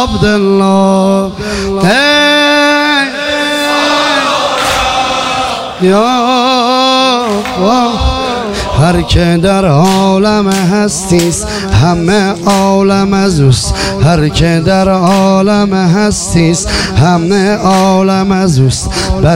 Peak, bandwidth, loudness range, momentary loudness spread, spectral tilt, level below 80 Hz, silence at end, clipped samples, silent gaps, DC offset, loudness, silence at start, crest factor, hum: 0 dBFS; 16 kHz; 1 LU; 5 LU; -5 dB/octave; -26 dBFS; 0 s; under 0.1%; none; under 0.1%; -9 LUFS; 0 s; 8 dB; none